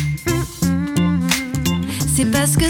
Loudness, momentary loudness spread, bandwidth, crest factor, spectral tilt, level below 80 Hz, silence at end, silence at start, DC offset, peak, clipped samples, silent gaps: -18 LUFS; 5 LU; 19.5 kHz; 18 dB; -4.5 dB/octave; -34 dBFS; 0 s; 0 s; under 0.1%; 0 dBFS; under 0.1%; none